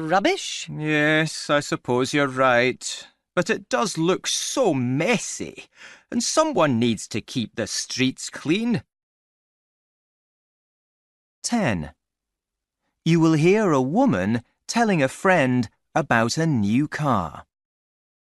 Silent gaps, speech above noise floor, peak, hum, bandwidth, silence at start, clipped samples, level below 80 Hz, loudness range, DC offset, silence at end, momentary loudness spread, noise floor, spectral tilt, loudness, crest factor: 9.03-11.42 s; 63 dB; -4 dBFS; none; 12 kHz; 0 s; under 0.1%; -58 dBFS; 11 LU; under 0.1%; 0.9 s; 11 LU; -85 dBFS; -4.5 dB/octave; -22 LUFS; 20 dB